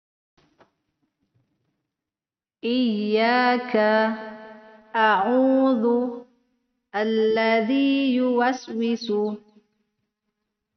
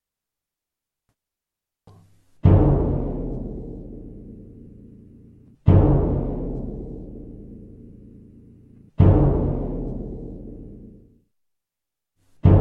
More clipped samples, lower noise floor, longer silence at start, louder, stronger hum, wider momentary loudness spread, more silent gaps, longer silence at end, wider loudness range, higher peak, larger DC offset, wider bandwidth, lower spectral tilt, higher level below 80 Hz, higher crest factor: neither; about the same, under -90 dBFS vs -87 dBFS; first, 2.65 s vs 2.45 s; about the same, -22 LUFS vs -21 LUFS; neither; second, 13 LU vs 25 LU; neither; first, 1.4 s vs 0 s; about the same, 4 LU vs 3 LU; second, -6 dBFS vs -2 dBFS; neither; first, 6.4 kHz vs 3.5 kHz; second, -3 dB/octave vs -12.5 dB/octave; second, -72 dBFS vs -30 dBFS; about the same, 18 dB vs 20 dB